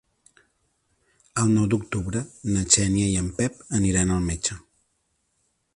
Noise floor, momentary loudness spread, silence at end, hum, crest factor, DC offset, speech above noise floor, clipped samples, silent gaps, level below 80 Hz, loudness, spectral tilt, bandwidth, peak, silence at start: -72 dBFS; 11 LU; 1.2 s; none; 22 dB; under 0.1%; 49 dB; under 0.1%; none; -42 dBFS; -23 LUFS; -4.5 dB/octave; 11.5 kHz; -4 dBFS; 1.35 s